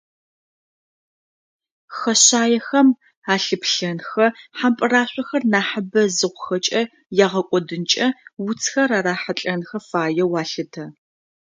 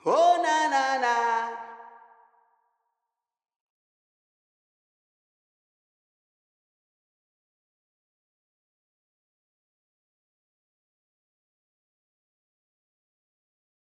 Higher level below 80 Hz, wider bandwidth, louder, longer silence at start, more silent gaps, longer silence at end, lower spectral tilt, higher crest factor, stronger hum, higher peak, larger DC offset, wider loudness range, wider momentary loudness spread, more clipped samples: first, -70 dBFS vs under -90 dBFS; about the same, 10 kHz vs 10 kHz; first, -19 LUFS vs -24 LUFS; first, 1.9 s vs 0.05 s; first, 3.17-3.22 s vs none; second, 0.55 s vs 12.1 s; about the same, -3 dB/octave vs -2 dB/octave; about the same, 20 dB vs 22 dB; neither; first, 0 dBFS vs -10 dBFS; neither; second, 4 LU vs 15 LU; second, 11 LU vs 16 LU; neither